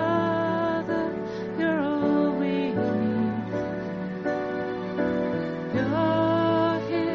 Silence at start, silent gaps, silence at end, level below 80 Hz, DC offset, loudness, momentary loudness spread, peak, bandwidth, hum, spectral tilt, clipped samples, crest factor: 0 s; none; 0 s; -58 dBFS; under 0.1%; -26 LUFS; 7 LU; -10 dBFS; 6.6 kHz; none; -6 dB/octave; under 0.1%; 14 dB